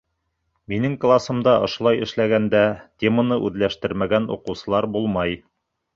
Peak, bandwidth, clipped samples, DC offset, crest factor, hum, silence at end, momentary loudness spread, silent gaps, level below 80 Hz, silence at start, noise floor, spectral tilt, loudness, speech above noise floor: -4 dBFS; 7.6 kHz; under 0.1%; under 0.1%; 18 dB; none; 0.6 s; 7 LU; none; -50 dBFS; 0.7 s; -74 dBFS; -7 dB/octave; -21 LUFS; 53 dB